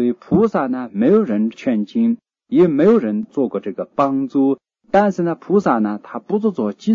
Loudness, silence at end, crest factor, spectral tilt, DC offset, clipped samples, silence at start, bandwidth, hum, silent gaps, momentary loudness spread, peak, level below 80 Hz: -18 LUFS; 0 s; 14 dB; -8.5 dB/octave; under 0.1%; under 0.1%; 0 s; 7.2 kHz; none; none; 8 LU; -2 dBFS; -56 dBFS